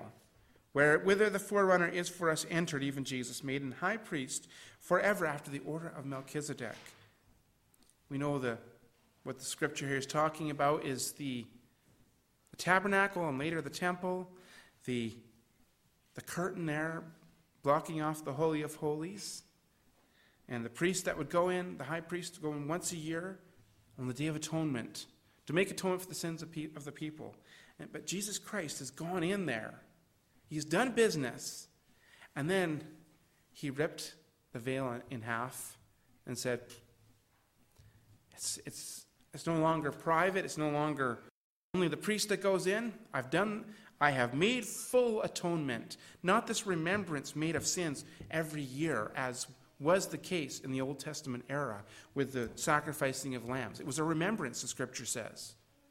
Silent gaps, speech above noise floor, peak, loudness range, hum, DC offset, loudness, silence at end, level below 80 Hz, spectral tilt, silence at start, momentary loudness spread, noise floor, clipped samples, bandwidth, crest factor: 41.30-41.74 s; 36 dB; -12 dBFS; 8 LU; none; under 0.1%; -35 LUFS; 0.35 s; -70 dBFS; -4.5 dB/octave; 0 s; 14 LU; -72 dBFS; under 0.1%; 16 kHz; 24 dB